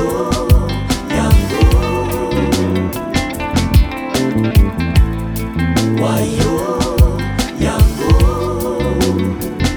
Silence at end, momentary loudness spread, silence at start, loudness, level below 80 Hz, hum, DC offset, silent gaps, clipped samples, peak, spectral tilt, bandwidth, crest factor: 0 s; 5 LU; 0 s; -15 LUFS; -18 dBFS; none; under 0.1%; none; under 0.1%; 0 dBFS; -6 dB/octave; over 20 kHz; 14 dB